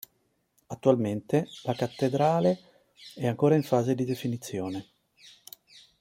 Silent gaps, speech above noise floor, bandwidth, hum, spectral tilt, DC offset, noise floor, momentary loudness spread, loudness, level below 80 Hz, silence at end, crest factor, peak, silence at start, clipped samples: none; 46 dB; 16.5 kHz; none; -7 dB/octave; under 0.1%; -73 dBFS; 23 LU; -27 LUFS; -68 dBFS; 1.2 s; 22 dB; -6 dBFS; 0.7 s; under 0.1%